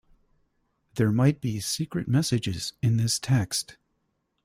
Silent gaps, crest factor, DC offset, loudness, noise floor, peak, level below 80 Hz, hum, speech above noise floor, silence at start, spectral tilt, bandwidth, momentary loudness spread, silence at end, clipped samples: none; 18 dB; under 0.1%; -26 LUFS; -75 dBFS; -10 dBFS; -56 dBFS; none; 50 dB; 0.95 s; -5 dB/octave; 16 kHz; 8 LU; 0.7 s; under 0.1%